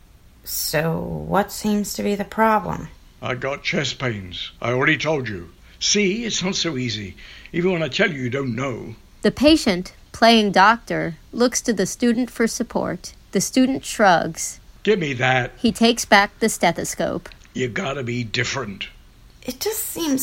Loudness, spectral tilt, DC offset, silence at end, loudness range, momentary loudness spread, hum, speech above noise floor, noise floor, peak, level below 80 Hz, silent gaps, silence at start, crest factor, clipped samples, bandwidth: -20 LUFS; -4 dB/octave; under 0.1%; 0 s; 5 LU; 15 LU; none; 26 dB; -47 dBFS; 0 dBFS; -46 dBFS; none; 0.45 s; 20 dB; under 0.1%; 16.5 kHz